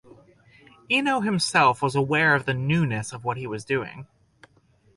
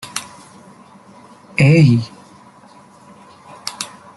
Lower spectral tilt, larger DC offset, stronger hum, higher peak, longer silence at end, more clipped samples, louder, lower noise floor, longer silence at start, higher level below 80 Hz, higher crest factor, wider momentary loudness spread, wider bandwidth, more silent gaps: about the same, -5 dB/octave vs -6 dB/octave; neither; neither; second, -6 dBFS vs -2 dBFS; first, 0.9 s vs 0.3 s; neither; second, -23 LUFS vs -16 LUFS; first, -61 dBFS vs -45 dBFS; first, 0.9 s vs 0.05 s; about the same, -58 dBFS vs -54 dBFS; about the same, 18 dB vs 18 dB; second, 11 LU vs 21 LU; about the same, 11.5 kHz vs 12 kHz; neither